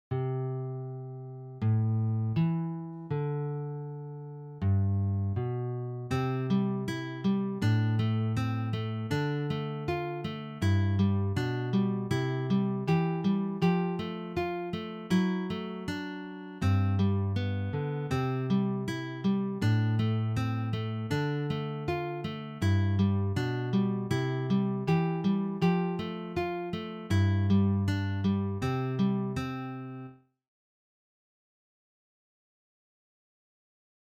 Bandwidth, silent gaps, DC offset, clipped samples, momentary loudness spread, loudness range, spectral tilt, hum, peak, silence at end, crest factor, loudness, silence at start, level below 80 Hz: 9.2 kHz; none; under 0.1%; under 0.1%; 9 LU; 3 LU; -8 dB/octave; none; -14 dBFS; 3.9 s; 16 dB; -30 LUFS; 0.1 s; -60 dBFS